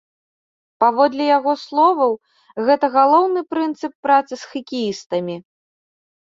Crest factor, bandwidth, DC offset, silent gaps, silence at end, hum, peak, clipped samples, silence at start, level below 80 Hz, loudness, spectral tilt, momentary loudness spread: 18 dB; 7.8 kHz; under 0.1%; 3.95-4.03 s, 5.06-5.10 s; 0.9 s; none; -2 dBFS; under 0.1%; 0.8 s; -68 dBFS; -18 LUFS; -5.5 dB/octave; 15 LU